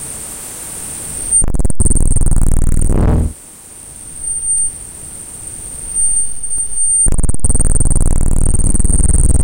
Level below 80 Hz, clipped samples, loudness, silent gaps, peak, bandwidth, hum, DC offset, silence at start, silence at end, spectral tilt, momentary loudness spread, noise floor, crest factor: -14 dBFS; under 0.1%; -15 LUFS; none; -2 dBFS; 17 kHz; none; under 0.1%; 0 s; 0 s; -5 dB/octave; 15 LU; -35 dBFS; 10 dB